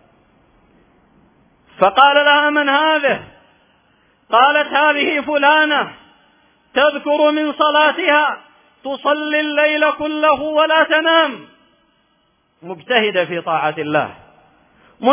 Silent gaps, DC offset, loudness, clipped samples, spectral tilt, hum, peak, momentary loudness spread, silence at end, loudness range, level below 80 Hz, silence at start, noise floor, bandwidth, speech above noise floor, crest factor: none; under 0.1%; -15 LUFS; under 0.1%; -7 dB/octave; none; 0 dBFS; 9 LU; 0 s; 4 LU; -60 dBFS; 1.8 s; -61 dBFS; 3.9 kHz; 46 dB; 16 dB